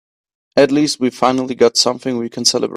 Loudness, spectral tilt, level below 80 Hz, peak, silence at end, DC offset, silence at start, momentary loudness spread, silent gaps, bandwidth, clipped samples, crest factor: -15 LUFS; -3 dB/octave; -60 dBFS; 0 dBFS; 0 s; under 0.1%; 0.55 s; 7 LU; none; 15 kHz; under 0.1%; 16 dB